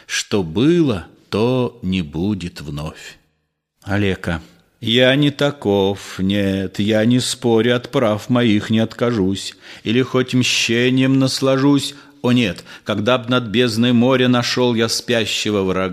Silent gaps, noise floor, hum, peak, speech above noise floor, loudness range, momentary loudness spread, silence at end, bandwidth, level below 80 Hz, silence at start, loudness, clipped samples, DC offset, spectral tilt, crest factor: none; -70 dBFS; none; 0 dBFS; 53 dB; 5 LU; 11 LU; 0 s; 15 kHz; -48 dBFS; 0.1 s; -17 LUFS; under 0.1%; under 0.1%; -5 dB/octave; 18 dB